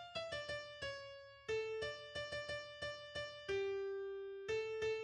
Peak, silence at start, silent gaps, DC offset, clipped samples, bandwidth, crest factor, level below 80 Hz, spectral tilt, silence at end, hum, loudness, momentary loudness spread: -30 dBFS; 0 s; none; under 0.1%; under 0.1%; 10.5 kHz; 14 dB; -70 dBFS; -3.5 dB/octave; 0 s; none; -44 LUFS; 6 LU